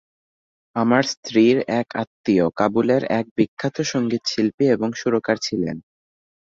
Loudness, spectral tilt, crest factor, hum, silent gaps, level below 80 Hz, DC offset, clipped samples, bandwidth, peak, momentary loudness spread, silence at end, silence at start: -21 LUFS; -5.5 dB/octave; 18 dB; none; 1.17-1.23 s, 2.07-2.24 s, 3.31-3.36 s, 3.48-3.57 s, 4.54-4.58 s; -58 dBFS; under 0.1%; under 0.1%; 7.6 kHz; -2 dBFS; 8 LU; 0.7 s; 0.75 s